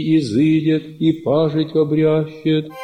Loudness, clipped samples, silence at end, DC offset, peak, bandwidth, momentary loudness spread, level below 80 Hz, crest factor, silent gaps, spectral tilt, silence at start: -17 LUFS; under 0.1%; 0 s; under 0.1%; -4 dBFS; 9.6 kHz; 4 LU; -56 dBFS; 12 dB; none; -8 dB/octave; 0 s